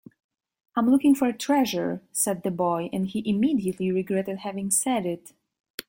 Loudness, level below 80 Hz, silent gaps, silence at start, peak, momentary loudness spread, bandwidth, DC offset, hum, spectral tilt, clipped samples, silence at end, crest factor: -25 LUFS; -66 dBFS; 5.60-5.64 s, 5.70-5.78 s; 0.75 s; -8 dBFS; 10 LU; 17 kHz; under 0.1%; none; -4.5 dB/octave; under 0.1%; 0.1 s; 16 dB